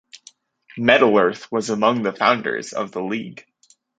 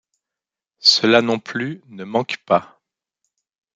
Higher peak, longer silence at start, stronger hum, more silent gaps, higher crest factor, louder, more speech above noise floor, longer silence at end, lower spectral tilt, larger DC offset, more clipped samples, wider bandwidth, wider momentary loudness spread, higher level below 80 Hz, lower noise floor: about the same, -2 dBFS vs 0 dBFS; second, 0.15 s vs 0.85 s; neither; neither; about the same, 20 dB vs 20 dB; about the same, -19 LUFS vs -18 LUFS; second, 32 dB vs 69 dB; second, 0.6 s vs 1.1 s; about the same, -4.5 dB/octave vs -3.5 dB/octave; neither; neither; second, 9.2 kHz vs 12 kHz; about the same, 13 LU vs 13 LU; about the same, -66 dBFS vs -68 dBFS; second, -51 dBFS vs -88 dBFS